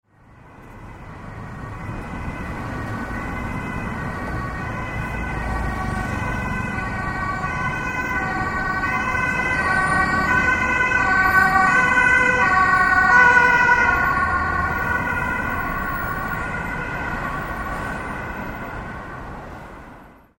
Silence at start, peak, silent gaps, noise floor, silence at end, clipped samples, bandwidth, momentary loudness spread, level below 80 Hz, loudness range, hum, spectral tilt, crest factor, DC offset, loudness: 0.45 s; -2 dBFS; none; -48 dBFS; 0.3 s; under 0.1%; 16.5 kHz; 17 LU; -36 dBFS; 14 LU; none; -5 dB/octave; 20 dB; under 0.1%; -20 LUFS